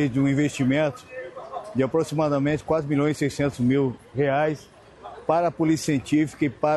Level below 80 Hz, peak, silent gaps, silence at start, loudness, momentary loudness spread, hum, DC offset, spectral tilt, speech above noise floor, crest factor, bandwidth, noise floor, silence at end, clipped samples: -54 dBFS; -8 dBFS; none; 0 s; -24 LUFS; 14 LU; none; under 0.1%; -6.5 dB/octave; 20 dB; 16 dB; 12.5 kHz; -43 dBFS; 0 s; under 0.1%